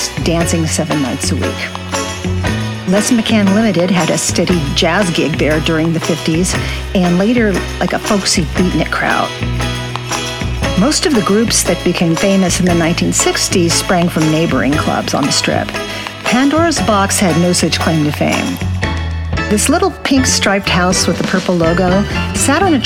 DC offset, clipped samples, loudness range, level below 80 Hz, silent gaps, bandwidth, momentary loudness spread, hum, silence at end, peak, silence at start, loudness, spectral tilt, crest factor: under 0.1%; under 0.1%; 2 LU; -28 dBFS; none; 17.5 kHz; 7 LU; none; 0 s; 0 dBFS; 0 s; -13 LUFS; -4 dB/octave; 14 dB